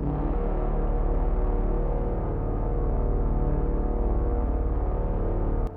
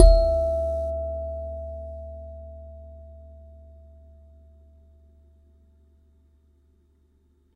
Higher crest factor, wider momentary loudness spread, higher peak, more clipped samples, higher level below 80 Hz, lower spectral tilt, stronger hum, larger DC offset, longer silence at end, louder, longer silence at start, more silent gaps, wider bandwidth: second, 10 dB vs 26 dB; second, 2 LU vs 26 LU; second, -14 dBFS vs 0 dBFS; neither; about the same, -26 dBFS vs -28 dBFS; first, -12 dB/octave vs -7.5 dB/octave; neither; neither; second, 0 s vs 4.4 s; about the same, -29 LUFS vs -27 LUFS; about the same, 0 s vs 0 s; neither; second, 2.7 kHz vs 4.9 kHz